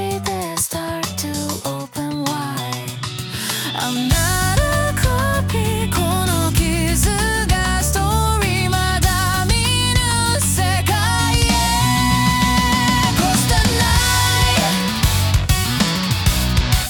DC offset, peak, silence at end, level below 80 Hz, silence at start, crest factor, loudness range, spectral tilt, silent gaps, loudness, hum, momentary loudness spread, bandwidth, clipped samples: under 0.1%; -2 dBFS; 0 s; -26 dBFS; 0 s; 14 dB; 6 LU; -3.5 dB/octave; none; -17 LUFS; none; 8 LU; 19 kHz; under 0.1%